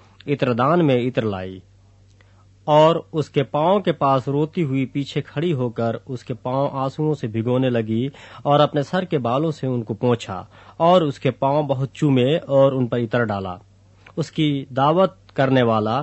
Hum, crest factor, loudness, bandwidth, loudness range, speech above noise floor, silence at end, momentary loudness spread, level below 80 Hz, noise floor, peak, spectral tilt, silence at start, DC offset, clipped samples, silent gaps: none; 18 dB; -20 LUFS; 8.4 kHz; 4 LU; 32 dB; 0 s; 11 LU; -58 dBFS; -51 dBFS; -2 dBFS; -7.5 dB/octave; 0.25 s; under 0.1%; under 0.1%; none